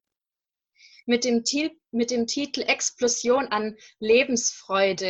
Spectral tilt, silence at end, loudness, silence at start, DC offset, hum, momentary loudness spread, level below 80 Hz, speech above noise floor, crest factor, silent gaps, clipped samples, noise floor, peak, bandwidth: -2 dB/octave; 0 s; -24 LUFS; 1.05 s; under 0.1%; none; 8 LU; -66 dBFS; over 66 dB; 18 dB; none; under 0.1%; under -90 dBFS; -8 dBFS; 8.6 kHz